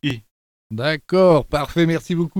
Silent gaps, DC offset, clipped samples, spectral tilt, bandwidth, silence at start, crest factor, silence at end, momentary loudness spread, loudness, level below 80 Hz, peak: 0.31-0.70 s; under 0.1%; under 0.1%; -7 dB/octave; 16 kHz; 0.05 s; 16 dB; 0 s; 14 LU; -18 LUFS; -42 dBFS; -2 dBFS